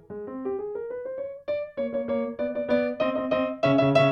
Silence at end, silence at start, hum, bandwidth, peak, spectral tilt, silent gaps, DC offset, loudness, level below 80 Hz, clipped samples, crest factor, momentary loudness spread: 0 s; 0.1 s; none; 8.6 kHz; -8 dBFS; -7.5 dB/octave; none; under 0.1%; -27 LUFS; -60 dBFS; under 0.1%; 18 dB; 12 LU